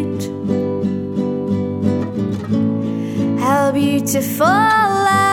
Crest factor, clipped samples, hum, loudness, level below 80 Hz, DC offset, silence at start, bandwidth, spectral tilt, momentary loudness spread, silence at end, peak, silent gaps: 16 dB; under 0.1%; none; -17 LUFS; -54 dBFS; under 0.1%; 0 s; 17 kHz; -5.5 dB/octave; 8 LU; 0 s; -2 dBFS; none